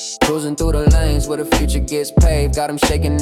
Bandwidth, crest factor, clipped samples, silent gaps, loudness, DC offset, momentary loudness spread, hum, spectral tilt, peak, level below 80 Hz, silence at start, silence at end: 16 kHz; 12 dB; under 0.1%; none; -17 LUFS; under 0.1%; 5 LU; none; -5 dB/octave; -4 dBFS; -18 dBFS; 0 s; 0 s